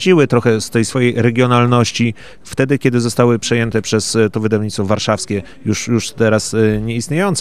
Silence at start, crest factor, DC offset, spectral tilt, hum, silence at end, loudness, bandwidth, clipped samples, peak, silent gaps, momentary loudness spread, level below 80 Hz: 0 s; 14 dB; 1%; -5.5 dB/octave; none; 0 s; -15 LUFS; 14.5 kHz; under 0.1%; 0 dBFS; none; 7 LU; -46 dBFS